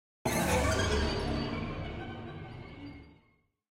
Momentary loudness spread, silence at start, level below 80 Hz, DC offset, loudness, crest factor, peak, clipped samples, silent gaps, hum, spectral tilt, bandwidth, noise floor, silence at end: 18 LU; 0.25 s; -42 dBFS; under 0.1%; -32 LUFS; 18 dB; -16 dBFS; under 0.1%; none; none; -4.5 dB/octave; 16 kHz; -70 dBFS; 0.6 s